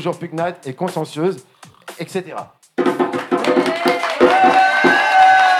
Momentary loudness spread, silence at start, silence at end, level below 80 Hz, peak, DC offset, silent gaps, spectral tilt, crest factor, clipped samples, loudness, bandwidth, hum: 16 LU; 0 s; 0 s; -62 dBFS; -2 dBFS; under 0.1%; none; -4.5 dB/octave; 14 dB; under 0.1%; -16 LUFS; 14.5 kHz; none